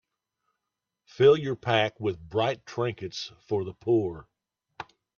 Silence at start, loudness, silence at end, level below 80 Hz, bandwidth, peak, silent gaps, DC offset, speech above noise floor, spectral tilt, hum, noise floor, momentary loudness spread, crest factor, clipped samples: 1.2 s; -27 LUFS; 0.35 s; -64 dBFS; 7 kHz; -8 dBFS; none; under 0.1%; 59 dB; -6 dB/octave; none; -86 dBFS; 20 LU; 20 dB; under 0.1%